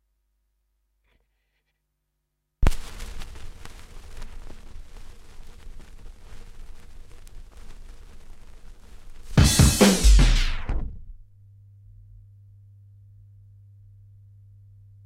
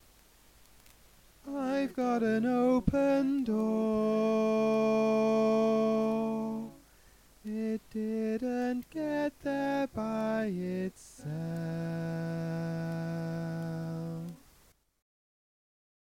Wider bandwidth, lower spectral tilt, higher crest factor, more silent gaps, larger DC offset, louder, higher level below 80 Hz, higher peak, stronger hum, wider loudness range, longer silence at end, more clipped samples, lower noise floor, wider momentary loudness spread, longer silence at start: about the same, 16 kHz vs 16 kHz; second, -4.5 dB/octave vs -7.5 dB/octave; about the same, 24 dB vs 20 dB; neither; neither; first, -21 LUFS vs -31 LUFS; first, -28 dBFS vs -56 dBFS; first, -4 dBFS vs -12 dBFS; neither; first, 24 LU vs 9 LU; first, 3.9 s vs 1.65 s; neither; first, -78 dBFS vs -65 dBFS; first, 30 LU vs 11 LU; first, 2.6 s vs 1.45 s